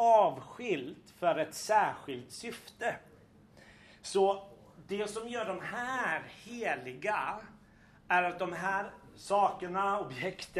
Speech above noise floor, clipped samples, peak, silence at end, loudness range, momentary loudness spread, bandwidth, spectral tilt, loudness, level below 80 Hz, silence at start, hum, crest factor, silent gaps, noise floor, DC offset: 26 dB; under 0.1%; -14 dBFS; 0 s; 3 LU; 14 LU; 13.5 kHz; -4 dB/octave; -33 LUFS; -70 dBFS; 0 s; none; 20 dB; none; -60 dBFS; under 0.1%